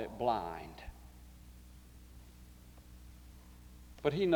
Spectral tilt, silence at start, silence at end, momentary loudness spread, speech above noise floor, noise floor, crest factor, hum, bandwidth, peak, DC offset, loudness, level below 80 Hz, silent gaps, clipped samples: -6.5 dB/octave; 0 s; 0 s; 22 LU; 22 dB; -56 dBFS; 24 dB; none; over 20 kHz; -16 dBFS; under 0.1%; -38 LUFS; -56 dBFS; none; under 0.1%